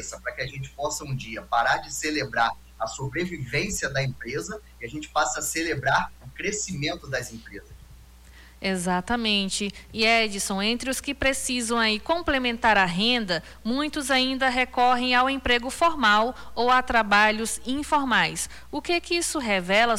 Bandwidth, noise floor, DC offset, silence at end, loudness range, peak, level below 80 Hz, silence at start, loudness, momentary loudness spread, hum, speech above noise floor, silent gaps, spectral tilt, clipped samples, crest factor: 17.5 kHz; -49 dBFS; under 0.1%; 0 s; 7 LU; -10 dBFS; -46 dBFS; 0 s; -24 LUFS; 12 LU; none; 24 dB; none; -3 dB/octave; under 0.1%; 16 dB